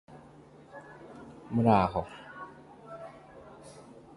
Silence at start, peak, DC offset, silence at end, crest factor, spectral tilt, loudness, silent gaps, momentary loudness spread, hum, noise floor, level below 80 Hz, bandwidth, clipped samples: 0.1 s; -8 dBFS; under 0.1%; 0.45 s; 26 dB; -8 dB/octave; -27 LUFS; none; 26 LU; none; -54 dBFS; -56 dBFS; 11.5 kHz; under 0.1%